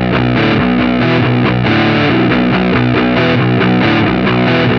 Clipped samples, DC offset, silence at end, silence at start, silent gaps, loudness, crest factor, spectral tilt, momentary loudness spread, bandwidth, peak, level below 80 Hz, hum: under 0.1%; under 0.1%; 0 s; 0 s; none; -11 LUFS; 10 dB; -8 dB/octave; 1 LU; 6.4 kHz; 0 dBFS; -32 dBFS; none